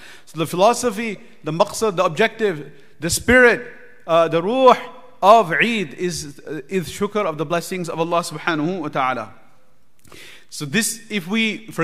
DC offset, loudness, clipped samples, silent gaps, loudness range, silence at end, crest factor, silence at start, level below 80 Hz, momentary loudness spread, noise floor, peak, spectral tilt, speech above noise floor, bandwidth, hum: 0.8%; -19 LUFS; under 0.1%; none; 8 LU; 0 s; 20 dB; 0 s; -50 dBFS; 17 LU; -60 dBFS; 0 dBFS; -4 dB/octave; 41 dB; 15.5 kHz; none